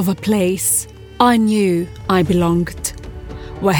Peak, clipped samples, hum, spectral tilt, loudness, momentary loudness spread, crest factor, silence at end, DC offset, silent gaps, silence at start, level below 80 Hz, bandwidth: -2 dBFS; under 0.1%; none; -5 dB/octave; -16 LUFS; 18 LU; 16 dB; 0 s; under 0.1%; none; 0 s; -38 dBFS; 18 kHz